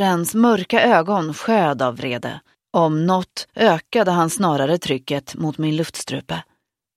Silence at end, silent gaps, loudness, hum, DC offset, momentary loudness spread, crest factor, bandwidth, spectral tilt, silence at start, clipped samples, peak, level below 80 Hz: 0.55 s; none; -19 LUFS; none; under 0.1%; 11 LU; 18 dB; 15 kHz; -5 dB/octave; 0 s; under 0.1%; 0 dBFS; -60 dBFS